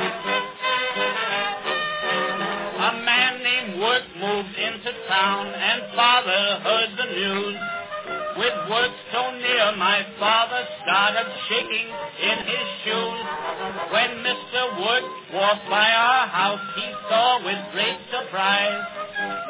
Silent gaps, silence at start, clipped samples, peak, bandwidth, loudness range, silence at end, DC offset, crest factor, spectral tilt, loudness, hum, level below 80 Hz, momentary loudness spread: none; 0 s; under 0.1%; -2 dBFS; 4 kHz; 3 LU; 0 s; under 0.1%; 20 dB; -6.5 dB/octave; -22 LUFS; none; -66 dBFS; 10 LU